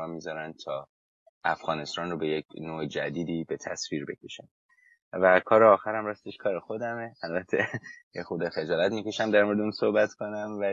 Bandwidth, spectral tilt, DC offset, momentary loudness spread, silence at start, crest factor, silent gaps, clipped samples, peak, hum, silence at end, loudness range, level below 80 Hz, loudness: 7.8 kHz; -5 dB/octave; under 0.1%; 16 LU; 0 s; 22 dB; 0.89-1.41 s, 2.45-2.49 s, 4.51-4.69 s, 5.02-5.12 s, 8.03-8.11 s; under 0.1%; -6 dBFS; none; 0 s; 8 LU; -66 dBFS; -28 LUFS